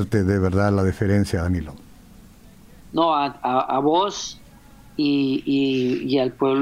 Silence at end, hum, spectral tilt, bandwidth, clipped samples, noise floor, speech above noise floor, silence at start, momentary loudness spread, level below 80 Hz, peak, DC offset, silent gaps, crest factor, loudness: 0 s; none; -6.5 dB/octave; 14.5 kHz; under 0.1%; -47 dBFS; 26 dB; 0 s; 8 LU; -44 dBFS; -6 dBFS; under 0.1%; none; 16 dB; -21 LUFS